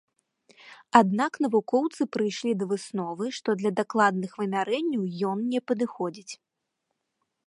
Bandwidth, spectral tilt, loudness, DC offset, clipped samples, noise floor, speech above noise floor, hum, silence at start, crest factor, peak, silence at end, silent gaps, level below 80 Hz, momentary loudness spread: 11.5 kHz; -5.5 dB/octave; -26 LUFS; under 0.1%; under 0.1%; -81 dBFS; 55 dB; none; 0.65 s; 26 dB; -2 dBFS; 1.15 s; none; -80 dBFS; 10 LU